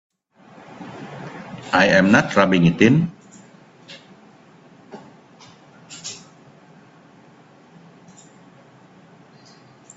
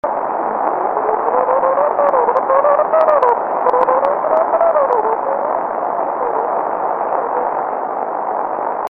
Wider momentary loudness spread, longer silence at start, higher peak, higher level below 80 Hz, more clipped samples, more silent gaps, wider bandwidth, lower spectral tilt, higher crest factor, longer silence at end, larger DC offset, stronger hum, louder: first, 28 LU vs 7 LU; first, 0.8 s vs 0.05 s; about the same, 0 dBFS vs 0 dBFS; about the same, -56 dBFS vs -58 dBFS; neither; neither; first, 8 kHz vs 5 kHz; second, -6 dB/octave vs -7.5 dB/octave; first, 24 dB vs 16 dB; first, 3.8 s vs 0 s; neither; neither; about the same, -16 LUFS vs -16 LUFS